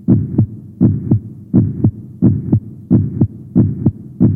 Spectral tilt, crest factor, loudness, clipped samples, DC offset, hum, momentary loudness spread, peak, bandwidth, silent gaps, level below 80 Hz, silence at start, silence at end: -14.5 dB/octave; 14 dB; -16 LUFS; under 0.1%; under 0.1%; none; 5 LU; 0 dBFS; 1.9 kHz; none; -38 dBFS; 0.1 s; 0 s